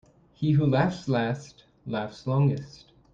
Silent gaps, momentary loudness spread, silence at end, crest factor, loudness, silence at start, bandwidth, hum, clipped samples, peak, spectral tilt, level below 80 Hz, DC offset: none; 13 LU; 0.45 s; 18 dB; -27 LUFS; 0.4 s; 7.4 kHz; none; under 0.1%; -10 dBFS; -8 dB/octave; -60 dBFS; under 0.1%